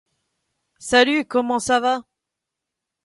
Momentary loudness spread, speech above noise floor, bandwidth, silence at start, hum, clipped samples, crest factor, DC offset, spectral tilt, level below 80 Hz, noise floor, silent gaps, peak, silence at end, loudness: 10 LU; 65 dB; 11.5 kHz; 0.8 s; none; under 0.1%; 22 dB; under 0.1%; -2.5 dB/octave; -58 dBFS; -83 dBFS; none; -2 dBFS; 1.05 s; -19 LUFS